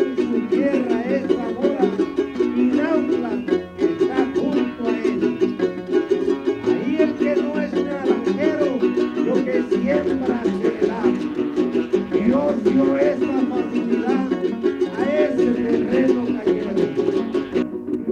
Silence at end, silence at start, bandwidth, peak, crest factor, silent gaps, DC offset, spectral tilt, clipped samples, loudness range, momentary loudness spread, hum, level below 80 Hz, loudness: 0 s; 0 s; 8.6 kHz; -4 dBFS; 16 dB; none; under 0.1%; -7 dB/octave; under 0.1%; 1 LU; 4 LU; none; -54 dBFS; -20 LUFS